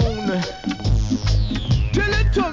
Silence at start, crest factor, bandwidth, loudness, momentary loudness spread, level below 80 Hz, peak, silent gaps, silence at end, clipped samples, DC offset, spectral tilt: 0 s; 12 dB; 7.6 kHz; -21 LUFS; 5 LU; -24 dBFS; -6 dBFS; none; 0 s; under 0.1%; under 0.1%; -6 dB/octave